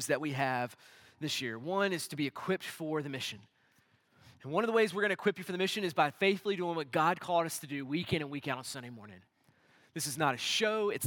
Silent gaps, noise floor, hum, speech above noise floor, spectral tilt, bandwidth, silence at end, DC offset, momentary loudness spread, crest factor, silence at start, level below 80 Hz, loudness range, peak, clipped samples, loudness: none; -70 dBFS; none; 36 dB; -4 dB/octave; 18 kHz; 0 s; under 0.1%; 11 LU; 20 dB; 0 s; -78 dBFS; 5 LU; -14 dBFS; under 0.1%; -33 LUFS